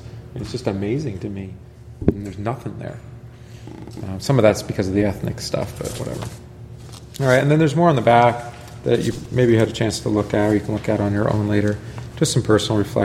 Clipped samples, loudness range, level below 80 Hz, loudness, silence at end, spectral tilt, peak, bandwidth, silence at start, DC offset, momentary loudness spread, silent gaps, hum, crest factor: under 0.1%; 9 LU; -42 dBFS; -20 LUFS; 0 s; -6 dB/octave; 0 dBFS; 15.5 kHz; 0 s; under 0.1%; 21 LU; none; none; 20 dB